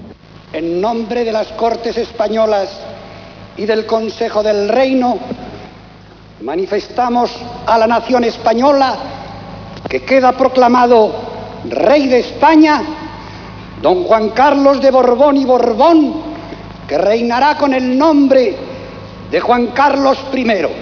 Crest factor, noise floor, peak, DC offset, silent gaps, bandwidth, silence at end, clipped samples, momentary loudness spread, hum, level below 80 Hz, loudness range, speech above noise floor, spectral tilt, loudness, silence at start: 14 dB; -38 dBFS; 0 dBFS; under 0.1%; none; 5.4 kHz; 0 s; under 0.1%; 19 LU; none; -42 dBFS; 6 LU; 26 dB; -5.5 dB/octave; -12 LUFS; 0 s